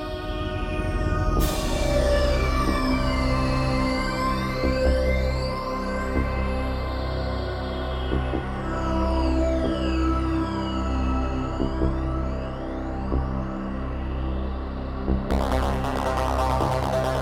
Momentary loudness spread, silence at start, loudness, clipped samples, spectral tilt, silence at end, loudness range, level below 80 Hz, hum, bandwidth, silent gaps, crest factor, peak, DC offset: 7 LU; 0 s; -26 LUFS; under 0.1%; -6.5 dB/octave; 0 s; 5 LU; -28 dBFS; none; 16.5 kHz; none; 16 dB; -8 dBFS; under 0.1%